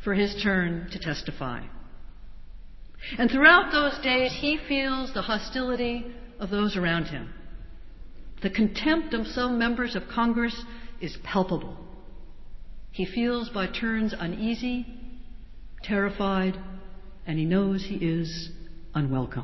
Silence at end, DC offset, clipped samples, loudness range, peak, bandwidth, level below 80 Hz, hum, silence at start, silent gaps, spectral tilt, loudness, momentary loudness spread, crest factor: 0 s; under 0.1%; under 0.1%; 8 LU; -4 dBFS; 6.2 kHz; -44 dBFS; none; 0 s; none; -6.5 dB/octave; -26 LUFS; 18 LU; 24 dB